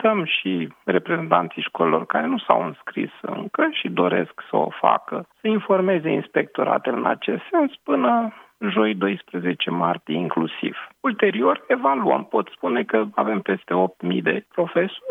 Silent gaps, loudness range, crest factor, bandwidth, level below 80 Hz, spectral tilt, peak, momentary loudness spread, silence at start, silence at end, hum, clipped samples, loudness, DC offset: none; 1 LU; 22 dB; 4 kHz; -76 dBFS; -8 dB/octave; 0 dBFS; 7 LU; 0 s; 0 s; none; under 0.1%; -22 LUFS; under 0.1%